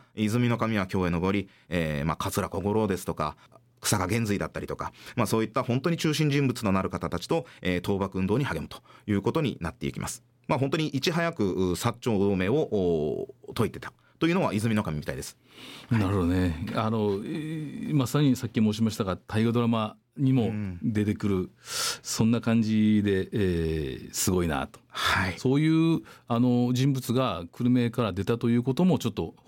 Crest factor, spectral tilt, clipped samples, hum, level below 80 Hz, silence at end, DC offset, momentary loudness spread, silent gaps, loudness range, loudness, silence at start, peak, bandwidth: 14 dB; -6 dB/octave; under 0.1%; none; -50 dBFS; 0.15 s; under 0.1%; 9 LU; none; 3 LU; -27 LUFS; 0.15 s; -12 dBFS; 17 kHz